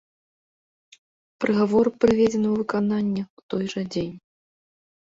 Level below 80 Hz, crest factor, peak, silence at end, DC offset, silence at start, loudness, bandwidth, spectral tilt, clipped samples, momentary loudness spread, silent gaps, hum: -56 dBFS; 18 dB; -6 dBFS; 0.95 s; under 0.1%; 1.4 s; -23 LUFS; 7.8 kHz; -7 dB/octave; under 0.1%; 11 LU; 3.30-3.37 s, 3.43-3.49 s; none